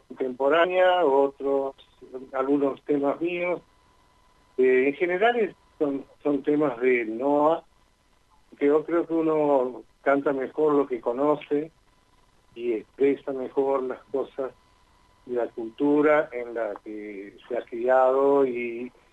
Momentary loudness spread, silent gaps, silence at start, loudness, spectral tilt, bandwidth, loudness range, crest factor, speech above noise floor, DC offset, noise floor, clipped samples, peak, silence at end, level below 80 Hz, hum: 13 LU; none; 0.1 s; -25 LUFS; -7 dB/octave; 7.8 kHz; 4 LU; 16 dB; 38 dB; under 0.1%; -62 dBFS; under 0.1%; -8 dBFS; 0.25 s; -66 dBFS; none